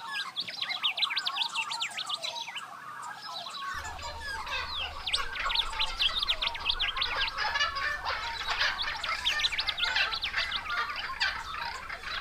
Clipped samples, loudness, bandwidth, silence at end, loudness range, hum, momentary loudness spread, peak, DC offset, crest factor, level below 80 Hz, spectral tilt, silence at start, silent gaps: under 0.1%; -30 LUFS; 16 kHz; 0 s; 6 LU; none; 10 LU; -14 dBFS; under 0.1%; 18 dB; -48 dBFS; 0 dB/octave; 0 s; none